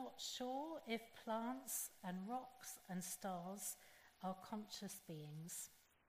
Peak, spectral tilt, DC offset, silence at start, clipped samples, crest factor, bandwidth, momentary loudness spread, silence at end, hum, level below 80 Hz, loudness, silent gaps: -32 dBFS; -3.5 dB/octave; under 0.1%; 0 s; under 0.1%; 18 dB; 15.5 kHz; 8 LU; 0.25 s; none; -84 dBFS; -49 LUFS; none